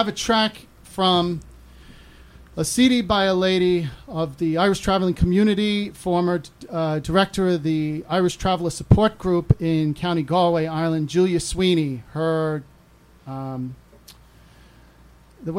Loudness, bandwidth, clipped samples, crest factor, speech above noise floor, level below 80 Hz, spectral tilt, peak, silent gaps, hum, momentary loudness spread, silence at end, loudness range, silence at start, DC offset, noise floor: -21 LUFS; 15.5 kHz; under 0.1%; 18 dB; 31 dB; -40 dBFS; -5.5 dB/octave; -4 dBFS; none; none; 12 LU; 0 s; 5 LU; 0 s; under 0.1%; -52 dBFS